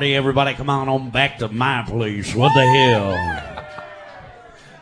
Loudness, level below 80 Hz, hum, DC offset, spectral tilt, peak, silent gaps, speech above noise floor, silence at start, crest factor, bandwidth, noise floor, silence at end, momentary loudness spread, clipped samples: -18 LUFS; -44 dBFS; none; under 0.1%; -5.5 dB/octave; 0 dBFS; none; 25 dB; 0 s; 18 dB; 10.5 kHz; -43 dBFS; 0.4 s; 21 LU; under 0.1%